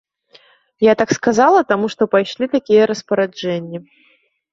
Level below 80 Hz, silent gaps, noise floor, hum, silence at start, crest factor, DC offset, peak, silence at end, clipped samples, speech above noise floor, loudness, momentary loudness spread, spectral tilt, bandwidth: -58 dBFS; none; -51 dBFS; none; 0.8 s; 16 dB; under 0.1%; 0 dBFS; 0.7 s; under 0.1%; 35 dB; -16 LUFS; 10 LU; -5 dB/octave; 7.6 kHz